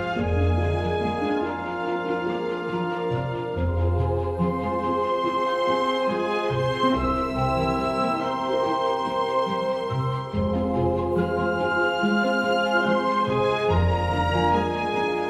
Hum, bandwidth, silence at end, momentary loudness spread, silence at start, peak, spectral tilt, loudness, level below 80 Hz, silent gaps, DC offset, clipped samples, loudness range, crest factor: none; 12 kHz; 0 s; 5 LU; 0 s; -10 dBFS; -7 dB/octave; -24 LUFS; -42 dBFS; none; under 0.1%; under 0.1%; 4 LU; 14 dB